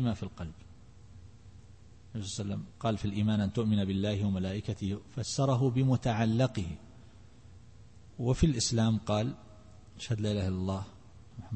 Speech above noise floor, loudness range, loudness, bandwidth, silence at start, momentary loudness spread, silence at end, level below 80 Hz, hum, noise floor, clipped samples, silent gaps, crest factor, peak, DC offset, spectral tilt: 24 dB; 4 LU; -31 LUFS; 8.8 kHz; 0 s; 17 LU; 0 s; -50 dBFS; none; -55 dBFS; under 0.1%; none; 18 dB; -14 dBFS; 0.1%; -6 dB/octave